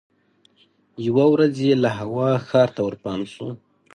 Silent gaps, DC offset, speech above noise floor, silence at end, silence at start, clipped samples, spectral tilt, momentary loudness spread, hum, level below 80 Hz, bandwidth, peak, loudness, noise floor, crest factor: none; under 0.1%; 41 dB; 0.4 s; 1 s; under 0.1%; -7.5 dB/octave; 15 LU; none; -60 dBFS; 11 kHz; -4 dBFS; -20 LUFS; -61 dBFS; 18 dB